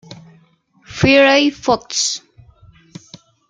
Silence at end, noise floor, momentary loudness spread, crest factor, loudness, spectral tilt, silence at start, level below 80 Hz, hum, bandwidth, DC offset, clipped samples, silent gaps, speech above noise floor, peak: 1.3 s; -54 dBFS; 14 LU; 18 dB; -14 LUFS; -3.5 dB/octave; 0.1 s; -50 dBFS; none; 9.4 kHz; under 0.1%; under 0.1%; none; 40 dB; 0 dBFS